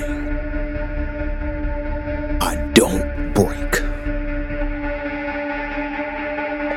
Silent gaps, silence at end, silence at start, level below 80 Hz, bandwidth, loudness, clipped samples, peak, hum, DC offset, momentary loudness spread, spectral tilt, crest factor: none; 0 s; 0 s; -26 dBFS; 16.5 kHz; -23 LUFS; under 0.1%; 0 dBFS; none; under 0.1%; 10 LU; -5 dB/octave; 22 dB